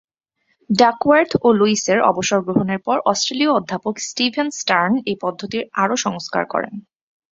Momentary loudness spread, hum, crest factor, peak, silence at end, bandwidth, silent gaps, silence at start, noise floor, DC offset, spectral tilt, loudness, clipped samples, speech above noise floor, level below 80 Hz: 9 LU; none; 18 dB; 0 dBFS; 0.55 s; 7.8 kHz; none; 0.7 s; -68 dBFS; under 0.1%; -4 dB/octave; -18 LUFS; under 0.1%; 50 dB; -58 dBFS